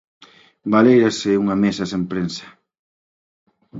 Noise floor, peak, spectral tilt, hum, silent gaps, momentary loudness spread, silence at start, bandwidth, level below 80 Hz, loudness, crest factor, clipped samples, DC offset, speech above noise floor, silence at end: under -90 dBFS; 0 dBFS; -6 dB/octave; none; 2.79-3.46 s; 14 LU; 0.65 s; 7.8 kHz; -56 dBFS; -18 LUFS; 20 dB; under 0.1%; under 0.1%; over 73 dB; 0 s